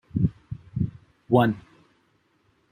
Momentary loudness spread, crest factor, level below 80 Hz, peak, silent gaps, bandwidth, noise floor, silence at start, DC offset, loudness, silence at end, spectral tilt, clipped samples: 15 LU; 22 dB; -48 dBFS; -6 dBFS; none; 15.5 kHz; -66 dBFS; 0.15 s; under 0.1%; -26 LUFS; 1.1 s; -9.5 dB/octave; under 0.1%